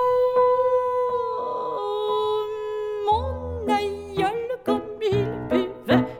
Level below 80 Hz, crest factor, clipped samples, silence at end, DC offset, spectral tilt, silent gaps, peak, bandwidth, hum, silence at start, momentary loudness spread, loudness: -46 dBFS; 18 dB; under 0.1%; 0 s; under 0.1%; -7 dB/octave; none; -6 dBFS; 15.5 kHz; none; 0 s; 9 LU; -24 LUFS